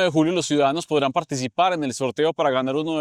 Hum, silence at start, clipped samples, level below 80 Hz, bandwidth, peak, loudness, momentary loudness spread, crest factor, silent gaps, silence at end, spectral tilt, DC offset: none; 0 s; under 0.1%; -62 dBFS; 13 kHz; -6 dBFS; -22 LUFS; 5 LU; 16 dB; none; 0 s; -4.5 dB/octave; under 0.1%